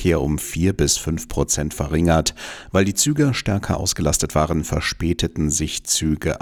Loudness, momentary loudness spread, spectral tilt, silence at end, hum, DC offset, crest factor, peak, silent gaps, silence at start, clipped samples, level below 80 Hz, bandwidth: -20 LUFS; 5 LU; -4 dB/octave; 0.05 s; none; under 0.1%; 14 dB; -6 dBFS; none; 0 s; under 0.1%; -32 dBFS; 18.5 kHz